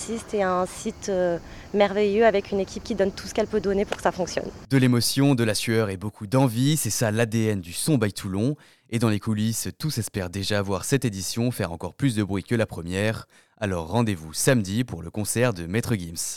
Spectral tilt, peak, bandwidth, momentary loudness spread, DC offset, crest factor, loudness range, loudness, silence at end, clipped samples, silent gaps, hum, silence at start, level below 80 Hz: -5 dB/octave; -6 dBFS; 18 kHz; 9 LU; under 0.1%; 18 dB; 4 LU; -25 LUFS; 0 s; under 0.1%; none; none; 0 s; -50 dBFS